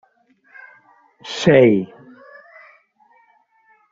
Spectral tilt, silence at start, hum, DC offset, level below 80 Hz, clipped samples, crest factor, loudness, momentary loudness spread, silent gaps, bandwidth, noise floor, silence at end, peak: -5.5 dB/octave; 1.25 s; none; under 0.1%; -58 dBFS; under 0.1%; 20 dB; -15 LUFS; 23 LU; none; 7.8 kHz; -58 dBFS; 2.05 s; -2 dBFS